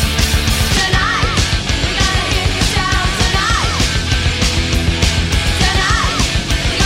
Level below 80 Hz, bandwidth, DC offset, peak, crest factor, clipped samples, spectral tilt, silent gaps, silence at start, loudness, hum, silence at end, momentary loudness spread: -20 dBFS; 16.5 kHz; under 0.1%; 0 dBFS; 14 dB; under 0.1%; -3.5 dB/octave; none; 0 s; -14 LUFS; none; 0 s; 2 LU